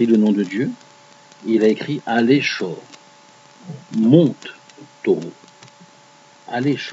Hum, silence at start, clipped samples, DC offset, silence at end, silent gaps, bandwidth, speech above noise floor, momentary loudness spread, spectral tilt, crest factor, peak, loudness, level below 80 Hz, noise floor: none; 0 s; under 0.1%; under 0.1%; 0 s; none; 7.8 kHz; 31 dB; 21 LU; -7 dB/octave; 20 dB; 0 dBFS; -18 LUFS; -72 dBFS; -48 dBFS